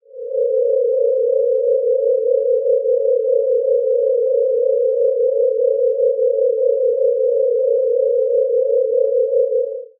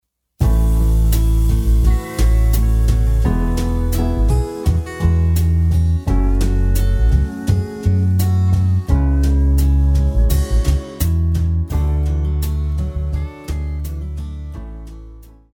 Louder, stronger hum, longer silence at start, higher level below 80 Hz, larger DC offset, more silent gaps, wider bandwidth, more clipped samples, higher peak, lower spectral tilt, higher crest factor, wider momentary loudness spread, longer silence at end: about the same, -17 LUFS vs -18 LUFS; neither; second, 0.15 s vs 0.4 s; second, under -90 dBFS vs -16 dBFS; neither; neither; second, 0.6 kHz vs 17.5 kHz; neither; second, -6 dBFS vs -2 dBFS; second, 5.5 dB/octave vs -7 dB/octave; about the same, 10 dB vs 12 dB; second, 0 LU vs 9 LU; second, 0.15 s vs 0.3 s